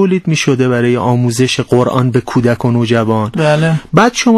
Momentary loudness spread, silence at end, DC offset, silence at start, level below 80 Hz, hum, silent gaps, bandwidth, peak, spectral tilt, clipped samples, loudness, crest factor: 3 LU; 0 s; under 0.1%; 0 s; -46 dBFS; none; none; 13 kHz; 0 dBFS; -6 dB/octave; 0.4%; -12 LUFS; 12 dB